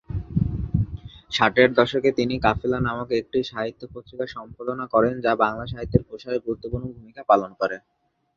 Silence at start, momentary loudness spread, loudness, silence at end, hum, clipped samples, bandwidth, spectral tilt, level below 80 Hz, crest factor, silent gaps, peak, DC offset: 0.1 s; 13 LU; -23 LUFS; 0.6 s; none; under 0.1%; 7.6 kHz; -7 dB/octave; -40 dBFS; 22 dB; none; -2 dBFS; under 0.1%